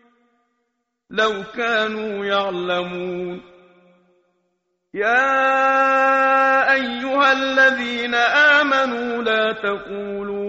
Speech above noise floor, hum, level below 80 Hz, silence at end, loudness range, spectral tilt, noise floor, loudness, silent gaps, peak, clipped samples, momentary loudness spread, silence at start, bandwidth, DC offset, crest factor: 55 dB; none; -60 dBFS; 0 s; 9 LU; -0.5 dB/octave; -74 dBFS; -18 LUFS; none; -4 dBFS; under 0.1%; 13 LU; 1.1 s; 8 kHz; under 0.1%; 16 dB